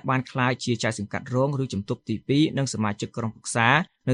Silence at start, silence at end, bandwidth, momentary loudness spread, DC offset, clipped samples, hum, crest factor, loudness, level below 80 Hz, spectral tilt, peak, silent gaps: 0.05 s; 0 s; 11 kHz; 10 LU; under 0.1%; under 0.1%; none; 20 dB; -25 LUFS; -60 dBFS; -5 dB/octave; -4 dBFS; none